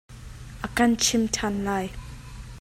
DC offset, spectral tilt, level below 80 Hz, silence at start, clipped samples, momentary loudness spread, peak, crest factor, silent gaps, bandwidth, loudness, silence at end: under 0.1%; -3 dB/octave; -44 dBFS; 0.1 s; under 0.1%; 22 LU; -8 dBFS; 18 dB; none; 16 kHz; -24 LUFS; 0 s